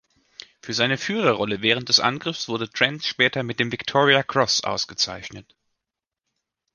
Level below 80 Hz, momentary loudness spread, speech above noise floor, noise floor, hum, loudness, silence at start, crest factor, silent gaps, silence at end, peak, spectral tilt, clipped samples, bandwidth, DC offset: -60 dBFS; 10 LU; 64 dB; -86 dBFS; none; -21 LUFS; 0.65 s; 22 dB; none; 1.35 s; -2 dBFS; -3 dB/octave; under 0.1%; 10.5 kHz; under 0.1%